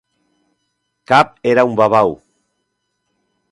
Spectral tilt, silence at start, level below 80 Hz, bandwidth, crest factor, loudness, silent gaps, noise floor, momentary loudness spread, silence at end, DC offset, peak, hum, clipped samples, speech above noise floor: -6 dB/octave; 1.1 s; -56 dBFS; 11.5 kHz; 18 dB; -14 LUFS; none; -71 dBFS; 5 LU; 1.35 s; under 0.1%; 0 dBFS; 60 Hz at -40 dBFS; under 0.1%; 58 dB